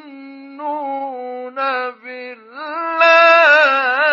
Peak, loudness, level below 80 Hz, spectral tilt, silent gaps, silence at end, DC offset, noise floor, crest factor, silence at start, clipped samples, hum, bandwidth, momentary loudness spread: 0 dBFS; -13 LUFS; under -90 dBFS; -1 dB/octave; none; 0 s; under 0.1%; -36 dBFS; 16 dB; 0.05 s; under 0.1%; none; 7.2 kHz; 22 LU